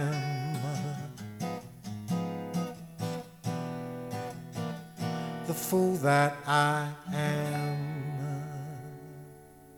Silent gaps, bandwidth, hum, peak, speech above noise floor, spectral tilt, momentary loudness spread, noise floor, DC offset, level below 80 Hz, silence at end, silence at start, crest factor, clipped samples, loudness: none; 19 kHz; none; -12 dBFS; 24 dB; -5.5 dB/octave; 15 LU; -52 dBFS; under 0.1%; -66 dBFS; 0 s; 0 s; 20 dB; under 0.1%; -32 LUFS